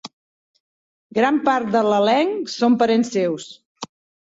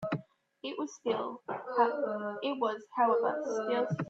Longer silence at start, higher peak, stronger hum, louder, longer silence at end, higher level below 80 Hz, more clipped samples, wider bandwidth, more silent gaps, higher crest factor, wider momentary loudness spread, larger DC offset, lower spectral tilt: about the same, 0.05 s vs 0 s; first, -4 dBFS vs -14 dBFS; neither; first, -19 LUFS vs -33 LUFS; first, 0.45 s vs 0 s; first, -66 dBFS vs -78 dBFS; neither; about the same, 8 kHz vs 7.8 kHz; first, 0.13-0.54 s, 0.60-1.10 s, 3.66-3.75 s vs none; about the same, 16 dB vs 18 dB; first, 20 LU vs 11 LU; neither; about the same, -5 dB/octave vs -6 dB/octave